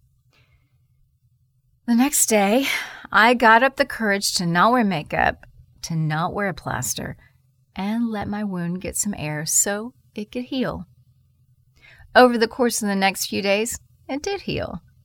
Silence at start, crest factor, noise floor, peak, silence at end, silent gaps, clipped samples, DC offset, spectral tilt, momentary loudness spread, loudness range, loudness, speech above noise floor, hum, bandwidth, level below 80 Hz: 1.85 s; 20 dB; -63 dBFS; -2 dBFS; 0.25 s; none; under 0.1%; under 0.1%; -3.5 dB/octave; 15 LU; 8 LU; -20 LUFS; 43 dB; none; 19.5 kHz; -50 dBFS